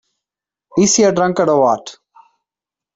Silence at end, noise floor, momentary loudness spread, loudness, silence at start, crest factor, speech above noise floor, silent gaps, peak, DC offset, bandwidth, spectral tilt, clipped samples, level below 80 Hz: 1.05 s; -88 dBFS; 11 LU; -14 LUFS; 0.75 s; 16 dB; 75 dB; none; -2 dBFS; under 0.1%; 8.2 kHz; -4 dB/octave; under 0.1%; -56 dBFS